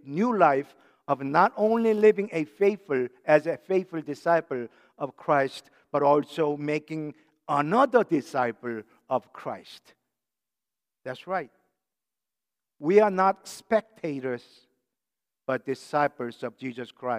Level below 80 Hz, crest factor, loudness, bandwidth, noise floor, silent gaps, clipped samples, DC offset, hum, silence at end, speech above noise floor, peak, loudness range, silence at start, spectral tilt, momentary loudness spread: -80 dBFS; 22 dB; -26 LUFS; 12.5 kHz; under -90 dBFS; none; under 0.1%; under 0.1%; none; 0 s; over 64 dB; -6 dBFS; 12 LU; 0.05 s; -6.5 dB/octave; 16 LU